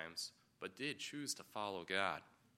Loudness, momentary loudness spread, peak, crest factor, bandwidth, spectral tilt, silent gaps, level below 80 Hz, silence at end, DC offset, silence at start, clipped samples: -44 LUFS; 11 LU; -20 dBFS; 24 dB; 16 kHz; -2 dB/octave; none; -84 dBFS; 0.3 s; under 0.1%; 0 s; under 0.1%